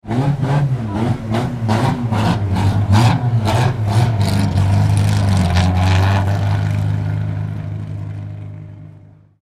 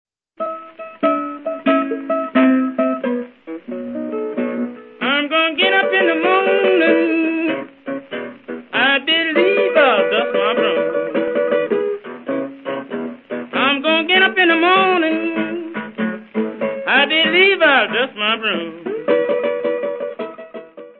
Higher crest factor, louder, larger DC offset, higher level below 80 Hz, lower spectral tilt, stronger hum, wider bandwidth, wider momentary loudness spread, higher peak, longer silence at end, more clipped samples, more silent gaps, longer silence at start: about the same, 16 dB vs 18 dB; about the same, -17 LUFS vs -17 LUFS; neither; first, -34 dBFS vs -70 dBFS; about the same, -7 dB/octave vs -8 dB/octave; neither; first, 13 kHz vs 4.4 kHz; second, 12 LU vs 15 LU; about the same, 0 dBFS vs 0 dBFS; first, 0.45 s vs 0.1 s; neither; neither; second, 0.05 s vs 0.4 s